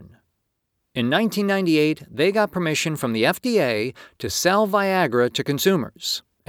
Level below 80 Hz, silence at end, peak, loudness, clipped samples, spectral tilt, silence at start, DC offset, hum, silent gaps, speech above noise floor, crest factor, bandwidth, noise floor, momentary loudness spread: -60 dBFS; 0.3 s; -4 dBFS; -21 LUFS; under 0.1%; -4.5 dB/octave; 0 s; under 0.1%; none; none; 54 dB; 18 dB; over 20 kHz; -75 dBFS; 7 LU